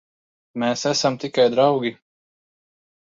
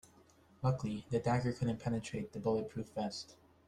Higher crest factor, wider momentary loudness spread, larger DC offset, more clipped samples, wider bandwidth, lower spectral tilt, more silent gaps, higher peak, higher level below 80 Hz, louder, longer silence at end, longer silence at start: about the same, 18 dB vs 18 dB; about the same, 10 LU vs 8 LU; neither; neither; second, 7.8 kHz vs 11 kHz; second, -4 dB/octave vs -7 dB/octave; neither; first, -4 dBFS vs -20 dBFS; second, -68 dBFS vs -62 dBFS; first, -20 LUFS vs -38 LUFS; first, 1.1 s vs 0.35 s; about the same, 0.55 s vs 0.6 s